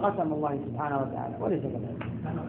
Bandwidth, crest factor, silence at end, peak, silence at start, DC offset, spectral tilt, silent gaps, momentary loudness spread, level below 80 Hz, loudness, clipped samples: 4 kHz; 18 dB; 0 s; -12 dBFS; 0 s; under 0.1%; -8 dB/octave; none; 6 LU; -58 dBFS; -31 LUFS; under 0.1%